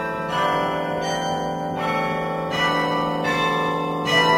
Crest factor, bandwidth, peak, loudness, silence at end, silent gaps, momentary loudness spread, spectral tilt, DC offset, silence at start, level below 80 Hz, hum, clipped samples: 16 dB; 16 kHz; -6 dBFS; -22 LUFS; 0 s; none; 5 LU; -4.5 dB/octave; under 0.1%; 0 s; -52 dBFS; none; under 0.1%